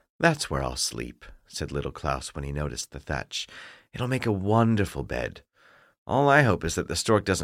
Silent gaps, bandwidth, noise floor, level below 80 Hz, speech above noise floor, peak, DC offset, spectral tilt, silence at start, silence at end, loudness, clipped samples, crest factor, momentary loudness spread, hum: 5.98-6.06 s; 16 kHz; -59 dBFS; -44 dBFS; 32 dB; -6 dBFS; under 0.1%; -5 dB/octave; 0.2 s; 0 s; -26 LUFS; under 0.1%; 20 dB; 16 LU; none